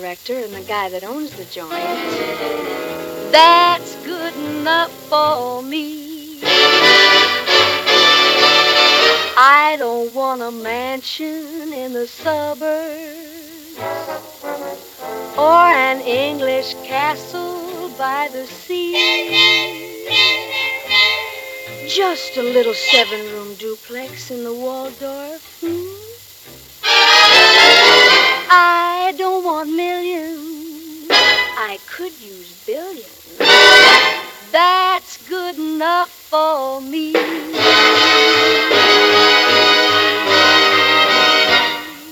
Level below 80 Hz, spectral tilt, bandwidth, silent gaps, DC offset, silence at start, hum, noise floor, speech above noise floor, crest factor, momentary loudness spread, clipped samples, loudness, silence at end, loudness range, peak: -58 dBFS; -1.5 dB/octave; over 20 kHz; none; under 0.1%; 0 s; none; -39 dBFS; 23 dB; 14 dB; 20 LU; 0.1%; -12 LUFS; 0 s; 13 LU; 0 dBFS